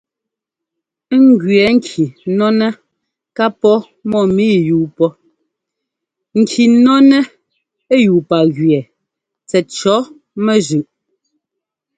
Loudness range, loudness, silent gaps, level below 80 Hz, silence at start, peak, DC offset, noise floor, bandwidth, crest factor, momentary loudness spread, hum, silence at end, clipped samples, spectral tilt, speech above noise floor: 4 LU; -13 LUFS; none; -56 dBFS; 1.1 s; 0 dBFS; under 0.1%; -82 dBFS; 9.2 kHz; 14 dB; 10 LU; none; 1.15 s; under 0.1%; -6 dB/octave; 71 dB